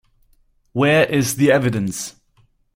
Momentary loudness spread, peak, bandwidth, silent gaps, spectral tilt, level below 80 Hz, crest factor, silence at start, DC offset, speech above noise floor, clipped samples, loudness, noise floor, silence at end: 14 LU; -2 dBFS; 16.5 kHz; none; -5 dB/octave; -52 dBFS; 18 dB; 0.75 s; under 0.1%; 42 dB; under 0.1%; -18 LUFS; -59 dBFS; 0.65 s